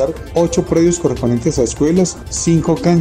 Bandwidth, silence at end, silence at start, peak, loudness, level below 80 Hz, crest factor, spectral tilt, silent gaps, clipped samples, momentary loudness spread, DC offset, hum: 13.5 kHz; 0 s; 0 s; 0 dBFS; -15 LUFS; -34 dBFS; 14 dB; -6 dB/octave; none; under 0.1%; 4 LU; under 0.1%; none